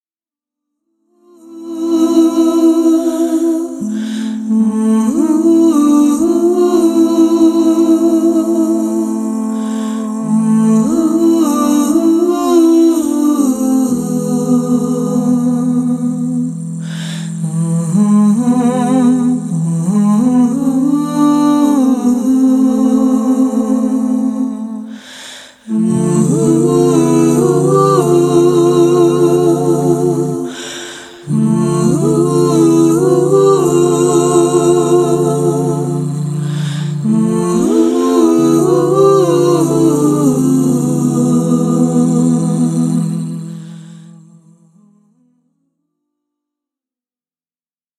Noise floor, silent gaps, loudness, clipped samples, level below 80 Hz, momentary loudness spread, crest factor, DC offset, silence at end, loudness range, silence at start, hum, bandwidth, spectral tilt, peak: under -90 dBFS; none; -12 LUFS; under 0.1%; -52 dBFS; 9 LU; 12 dB; under 0.1%; 3.95 s; 4 LU; 1.5 s; none; 13.5 kHz; -7 dB/octave; 0 dBFS